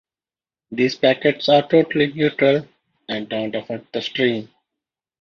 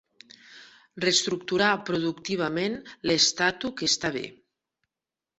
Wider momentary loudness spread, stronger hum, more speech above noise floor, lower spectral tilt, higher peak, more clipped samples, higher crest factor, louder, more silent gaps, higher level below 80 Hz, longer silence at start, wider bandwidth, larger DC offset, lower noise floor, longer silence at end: first, 13 LU vs 10 LU; neither; first, over 71 dB vs 64 dB; first, -6 dB/octave vs -2.5 dB/octave; first, -2 dBFS vs -8 dBFS; neither; about the same, 18 dB vs 20 dB; first, -19 LUFS vs -25 LUFS; neither; about the same, -64 dBFS vs -64 dBFS; first, 0.7 s vs 0.5 s; second, 7 kHz vs 8.4 kHz; neither; about the same, under -90 dBFS vs -90 dBFS; second, 0.75 s vs 1.05 s